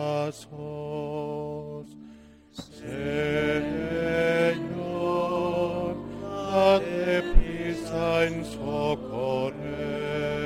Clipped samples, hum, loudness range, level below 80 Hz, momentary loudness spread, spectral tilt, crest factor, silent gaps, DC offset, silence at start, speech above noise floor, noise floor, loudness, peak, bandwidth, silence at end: under 0.1%; none; 6 LU; -34 dBFS; 14 LU; -6.5 dB/octave; 22 dB; none; under 0.1%; 0 s; 19 dB; -50 dBFS; -28 LUFS; -4 dBFS; 13.5 kHz; 0 s